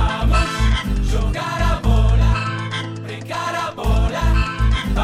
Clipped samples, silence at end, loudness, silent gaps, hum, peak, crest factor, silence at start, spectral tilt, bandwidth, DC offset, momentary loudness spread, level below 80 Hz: under 0.1%; 0 s; -20 LUFS; none; none; -6 dBFS; 12 dB; 0 s; -5.5 dB/octave; 12 kHz; under 0.1%; 8 LU; -20 dBFS